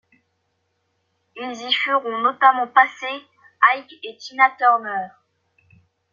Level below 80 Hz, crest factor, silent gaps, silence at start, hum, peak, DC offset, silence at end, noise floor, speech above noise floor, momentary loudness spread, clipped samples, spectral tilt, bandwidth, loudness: -78 dBFS; 22 dB; none; 1.35 s; none; 0 dBFS; under 0.1%; 1.05 s; -71 dBFS; 52 dB; 18 LU; under 0.1%; -2 dB/octave; 7.2 kHz; -18 LUFS